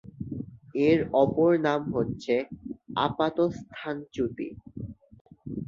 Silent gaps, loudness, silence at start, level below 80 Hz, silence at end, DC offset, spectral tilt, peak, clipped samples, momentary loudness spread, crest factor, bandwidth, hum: 5.21-5.25 s; -27 LUFS; 0.05 s; -56 dBFS; 0 s; under 0.1%; -7.5 dB/octave; -10 dBFS; under 0.1%; 18 LU; 18 dB; 7.4 kHz; none